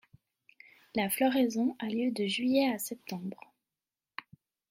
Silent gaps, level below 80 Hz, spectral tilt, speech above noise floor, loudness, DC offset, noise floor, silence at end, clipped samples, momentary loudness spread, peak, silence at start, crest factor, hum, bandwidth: none; -78 dBFS; -4 dB/octave; over 60 dB; -31 LUFS; under 0.1%; under -90 dBFS; 1.35 s; under 0.1%; 19 LU; -16 dBFS; 0.95 s; 18 dB; none; 16 kHz